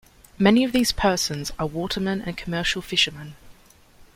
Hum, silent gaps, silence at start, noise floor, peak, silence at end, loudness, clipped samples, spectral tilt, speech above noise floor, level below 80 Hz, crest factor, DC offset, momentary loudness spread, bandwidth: none; none; 0.4 s; -52 dBFS; -4 dBFS; 0.65 s; -22 LUFS; under 0.1%; -4 dB/octave; 29 dB; -44 dBFS; 20 dB; under 0.1%; 10 LU; 16.5 kHz